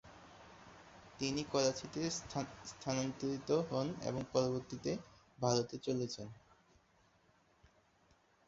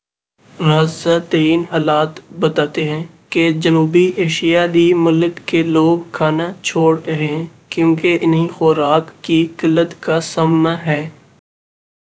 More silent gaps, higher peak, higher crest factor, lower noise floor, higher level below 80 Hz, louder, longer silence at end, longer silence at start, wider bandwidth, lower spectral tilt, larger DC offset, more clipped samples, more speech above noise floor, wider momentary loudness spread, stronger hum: neither; second, -18 dBFS vs 0 dBFS; first, 22 dB vs 16 dB; first, -71 dBFS vs -54 dBFS; second, -68 dBFS vs -60 dBFS; second, -39 LUFS vs -15 LUFS; first, 2.1 s vs 0.9 s; second, 0.05 s vs 0.6 s; about the same, 7.6 kHz vs 8 kHz; second, -5 dB/octave vs -6.5 dB/octave; neither; neither; second, 33 dB vs 40 dB; first, 22 LU vs 7 LU; neither